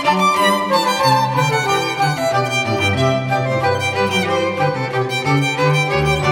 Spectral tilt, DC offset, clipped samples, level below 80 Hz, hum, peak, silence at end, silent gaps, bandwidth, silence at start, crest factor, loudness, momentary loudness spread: -5 dB/octave; under 0.1%; under 0.1%; -44 dBFS; none; -2 dBFS; 0 s; none; 17.5 kHz; 0 s; 14 dB; -16 LUFS; 4 LU